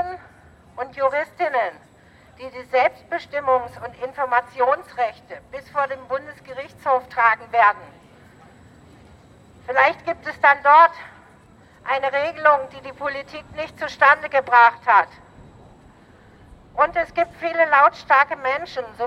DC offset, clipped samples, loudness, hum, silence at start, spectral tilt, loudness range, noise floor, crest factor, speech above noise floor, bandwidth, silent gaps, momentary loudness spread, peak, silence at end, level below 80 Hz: under 0.1%; under 0.1%; -19 LUFS; none; 0 s; -4.5 dB/octave; 6 LU; -50 dBFS; 20 dB; 31 dB; 11 kHz; none; 20 LU; 0 dBFS; 0 s; -56 dBFS